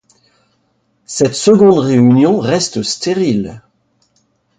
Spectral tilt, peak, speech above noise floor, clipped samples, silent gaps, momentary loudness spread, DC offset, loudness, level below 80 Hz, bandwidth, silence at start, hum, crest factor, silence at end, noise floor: -5.5 dB/octave; 0 dBFS; 50 dB; under 0.1%; none; 10 LU; under 0.1%; -12 LUFS; -52 dBFS; 9.4 kHz; 1.1 s; none; 14 dB; 1 s; -61 dBFS